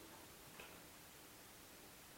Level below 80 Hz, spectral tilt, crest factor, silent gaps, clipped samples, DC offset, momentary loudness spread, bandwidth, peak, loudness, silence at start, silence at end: -76 dBFS; -2.5 dB/octave; 18 dB; none; under 0.1%; under 0.1%; 2 LU; 16.5 kHz; -42 dBFS; -58 LUFS; 0 s; 0 s